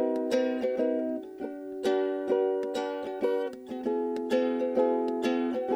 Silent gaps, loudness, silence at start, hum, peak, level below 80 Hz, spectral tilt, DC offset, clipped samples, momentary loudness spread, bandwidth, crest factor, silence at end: none; -30 LUFS; 0 s; none; -14 dBFS; -72 dBFS; -5 dB/octave; under 0.1%; under 0.1%; 8 LU; 13.5 kHz; 14 dB; 0 s